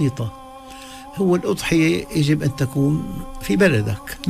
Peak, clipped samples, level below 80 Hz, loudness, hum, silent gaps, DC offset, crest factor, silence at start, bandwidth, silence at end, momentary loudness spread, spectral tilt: -4 dBFS; under 0.1%; -40 dBFS; -20 LUFS; none; none; under 0.1%; 16 dB; 0 s; 15.5 kHz; 0 s; 19 LU; -6 dB/octave